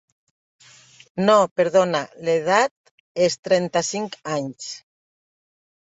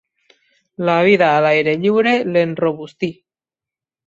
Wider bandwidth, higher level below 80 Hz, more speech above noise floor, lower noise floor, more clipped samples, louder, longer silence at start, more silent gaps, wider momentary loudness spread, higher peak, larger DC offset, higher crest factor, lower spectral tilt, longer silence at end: about the same, 8.4 kHz vs 7.8 kHz; second, -68 dBFS vs -62 dBFS; second, 30 dB vs 74 dB; second, -50 dBFS vs -89 dBFS; neither; second, -21 LUFS vs -16 LUFS; first, 1.15 s vs 0.8 s; first, 1.51-1.56 s, 2.71-2.84 s, 2.91-3.15 s, 3.39-3.43 s vs none; first, 17 LU vs 12 LU; about the same, -4 dBFS vs -2 dBFS; neither; about the same, 20 dB vs 16 dB; second, -4 dB/octave vs -7 dB/octave; first, 1.1 s vs 0.95 s